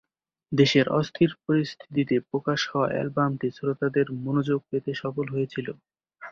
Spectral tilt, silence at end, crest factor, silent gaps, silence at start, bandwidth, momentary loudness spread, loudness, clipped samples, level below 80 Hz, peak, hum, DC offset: -6.5 dB/octave; 0 s; 20 dB; none; 0.5 s; 7.2 kHz; 9 LU; -26 LUFS; under 0.1%; -64 dBFS; -6 dBFS; none; under 0.1%